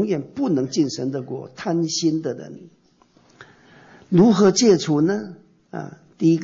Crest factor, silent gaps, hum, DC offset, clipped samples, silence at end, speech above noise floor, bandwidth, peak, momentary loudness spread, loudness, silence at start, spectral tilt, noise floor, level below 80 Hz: 16 dB; none; none; under 0.1%; under 0.1%; 0 s; 37 dB; 8 kHz; -6 dBFS; 20 LU; -20 LUFS; 0 s; -5.5 dB/octave; -57 dBFS; -62 dBFS